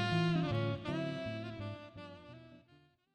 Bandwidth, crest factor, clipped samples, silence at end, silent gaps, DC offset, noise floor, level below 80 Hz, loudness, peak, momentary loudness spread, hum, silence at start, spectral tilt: 9 kHz; 16 dB; under 0.1%; 0.55 s; none; under 0.1%; -68 dBFS; -64 dBFS; -37 LUFS; -22 dBFS; 20 LU; none; 0 s; -7 dB/octave